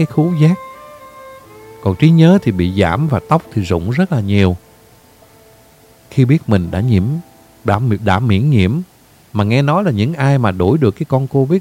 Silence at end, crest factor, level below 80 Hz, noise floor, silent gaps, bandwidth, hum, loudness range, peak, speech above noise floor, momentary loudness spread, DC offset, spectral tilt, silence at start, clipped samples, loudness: 0 s; 14 dB; -42 dBFS; -46 dBFS; none; 15 kHz; none; 4 LU; 0 dBFS; 33 dB; 10 LU; under 0.1%; -8 dB/octave; 0 s; under 0.1%; -14 LUFS